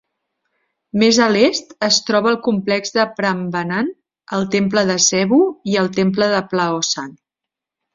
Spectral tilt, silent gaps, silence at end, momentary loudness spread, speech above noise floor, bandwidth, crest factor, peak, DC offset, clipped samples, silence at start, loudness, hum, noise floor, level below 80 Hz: -3.5 dB/octave; none; 0.85 s; 9 LU; 68 dB; 7.6 kHz; 16 dB; -2 dBFS; under 0.1%; under 0.1%; 0.95 s; -17 LUFS; none; -85 dBFS; -58 dBFS